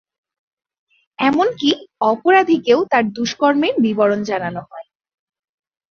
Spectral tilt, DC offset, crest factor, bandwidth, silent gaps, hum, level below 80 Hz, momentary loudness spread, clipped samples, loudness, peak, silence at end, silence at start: -5 dB/octave; under 0.1%; 16 dB; 7 kHz; none; none; -62 dBFS; 9 LU; under 0.1%; -17 LUFS; -2 dBFS; 1.1 s; 1.2 s